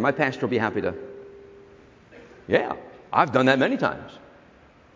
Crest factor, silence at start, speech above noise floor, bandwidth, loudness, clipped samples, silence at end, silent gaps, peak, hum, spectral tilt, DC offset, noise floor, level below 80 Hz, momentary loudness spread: 22 dB; 0 s; 30 dB; 7.6 kHz; -23 LUFS; under 0.1%; 0.8 s; none; -4 dBFS; none; -6.5 dB/octave; under 0.1%; -53 dBFS; -58 dBFS; 24 LU